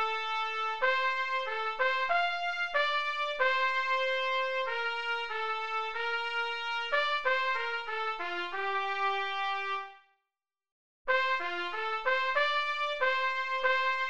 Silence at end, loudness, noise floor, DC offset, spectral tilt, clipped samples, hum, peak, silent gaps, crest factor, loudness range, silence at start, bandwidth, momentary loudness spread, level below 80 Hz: 0 s; -30 LUFS; -90 dBFS; 0.4%; -1 dB/octave; under 0.1%; none; -16 dBFS; 10.72-11.05 s; 16 dB; 4 LU; 0 s; 8.8 kHz; 6 LU; -70 dBFS